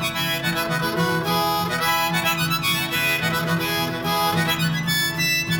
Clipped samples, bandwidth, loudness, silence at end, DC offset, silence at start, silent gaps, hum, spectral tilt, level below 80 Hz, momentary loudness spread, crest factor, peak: under 0.1%; 19 kHz; -21 LUFS; 0 s; under 0.1%; 0 s; none; none; -3.5 dB/octave; -50 dBFS; 3 LU; 14 dB; -8 dBFS